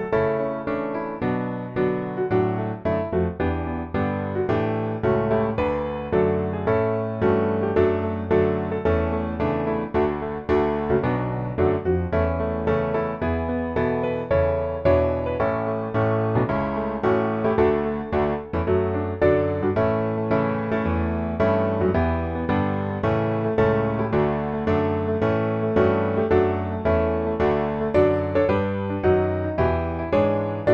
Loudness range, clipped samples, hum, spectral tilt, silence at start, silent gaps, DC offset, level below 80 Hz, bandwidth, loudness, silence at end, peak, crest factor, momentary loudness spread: 2 LU; under 0.1%; none; -10 dB/octave; 0 s; none; under 0.1%; -40 dBFS; 6.6 kHz; -23 LUFS; 0 s; -6 dBFS; 16 dB; 5 LU